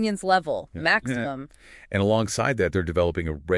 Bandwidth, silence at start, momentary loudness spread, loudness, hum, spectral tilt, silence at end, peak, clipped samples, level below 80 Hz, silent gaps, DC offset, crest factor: 12 kHz; 0 s; 9 LU; -24 LUFS; none; -5 dB/octave; 0 s; -6 dBFS; under 0.1%; -48 dBFS; none; under 0.1%; 18 dB